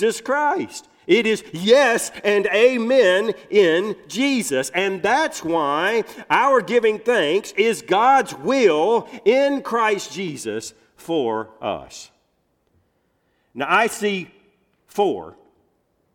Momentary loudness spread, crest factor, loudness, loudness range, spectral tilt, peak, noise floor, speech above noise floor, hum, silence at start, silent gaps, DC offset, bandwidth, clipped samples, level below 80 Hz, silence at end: 13 LU; 16 dB; -19 LUFS; 8 LU; -3.5 dB/octave; -4 dBFS; -67 dBFS; 48 dB; none; 0 s; none; under 0.1%; 17 kHz; under 0.1%; -64 dBFS; 0.85 s